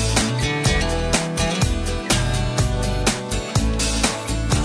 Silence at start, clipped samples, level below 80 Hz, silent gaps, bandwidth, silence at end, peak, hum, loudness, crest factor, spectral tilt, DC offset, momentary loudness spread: 0 s; under 0.1%; -26 dBFS; none; 11 kHz; 0 s; -4 dBFS; none; -21 LUFS; 16 dB; -4 dB/octave; under 0.1%; 3 LU